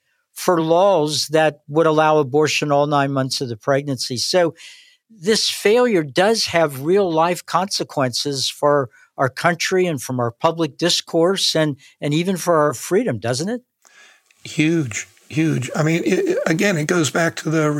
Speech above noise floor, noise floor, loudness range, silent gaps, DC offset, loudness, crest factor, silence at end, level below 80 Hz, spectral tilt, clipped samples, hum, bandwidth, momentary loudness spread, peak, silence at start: 32 dB; -51 dBFS; 4 LU; none; under 0.1%; -18 LUFS; 16 dB; 0 s; -68 dBFS; -4.5 dB/octave; under 0.1%; none; 17 kHz; 7 LU; -2 dBFS; 0.35 s